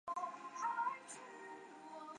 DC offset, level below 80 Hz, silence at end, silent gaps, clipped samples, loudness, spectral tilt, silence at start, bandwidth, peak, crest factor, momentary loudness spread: under 0.1%; under -90 dBFS; 0 s; none; under 0.1%; -45 LUFS; -2 dB/octave; 0.05 s; 11.5 kHz; -28 dBFS; 16 dB; 14 LU